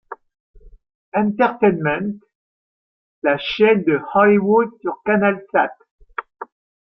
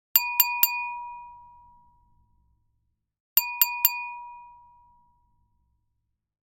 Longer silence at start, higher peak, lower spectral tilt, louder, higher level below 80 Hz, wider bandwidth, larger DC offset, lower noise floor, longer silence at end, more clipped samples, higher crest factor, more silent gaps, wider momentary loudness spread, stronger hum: about the same, 0.1 s vs 0.15 s; about the same, -2 dBFS vs 0 dBFS; first, -8.5 dB/octave vs 3.5 dB/octave; first, -18 LUFS vs -22 LUFS; first, -56 dBFS vs -70 dBFS; second, 5.8 kHz vs 19 kHz; neither; first, under -90 dBFS vs -78 dBFS; second, 0.4 s vs 1.9 s; neither; second, 18 dB vs 30 dB; first, 0.40-0.54 s, 0.95-1.12 s, 2.35-3.22 s, 5.91-5.99 s vs 3.20-3.36 s; about the same, 22 LU vs 21 LU; neither